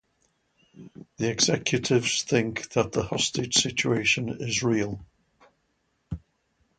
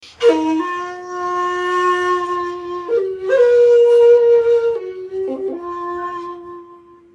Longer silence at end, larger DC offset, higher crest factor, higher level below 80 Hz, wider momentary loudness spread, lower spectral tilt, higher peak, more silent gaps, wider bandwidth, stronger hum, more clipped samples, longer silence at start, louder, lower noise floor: first, 0.6 s vs 0.4 s; neither; first, 22 dB vs 14 dB; first, -54 dBFS vs -60 dBFS; about the same, 15 LU vs 16 LU; about the same, -3.5 dB/octave vs -4.5 dB/octave; second, -6 dBFS vs -2 dBFS; neither; first, 9.6 kHz vs 8.6 kHz; neither; neither; first, 0.75 s vs 0.05 s; second, -25 LUFS vs -16 LUFS; first, -73 dBFS vs -43 dBFS